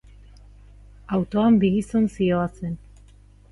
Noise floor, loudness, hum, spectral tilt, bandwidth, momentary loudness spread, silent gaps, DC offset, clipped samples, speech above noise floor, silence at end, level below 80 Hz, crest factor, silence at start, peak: -50 dBFS; -22 LUFS; 50 Hz at -40 dBFS; -8 dB/octave; 11.5 kHz; 15 LU; none; under 0.1%; under 0.1%; 29 dB; 0.75 s; -46 dBFS; 16 dB; 1.1 s; -8 dBFS